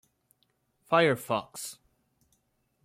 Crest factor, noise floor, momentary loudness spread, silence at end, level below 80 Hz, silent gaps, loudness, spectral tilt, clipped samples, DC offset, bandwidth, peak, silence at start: 22 dB; -74 dBFS; 16 LU; 1.1 s; -74 dBFS; none; -28 LUFS; -4.5 dB/octave; under 0.1%; under 0.1%; 16.5 kHz; -10 dBFS; 0.9 s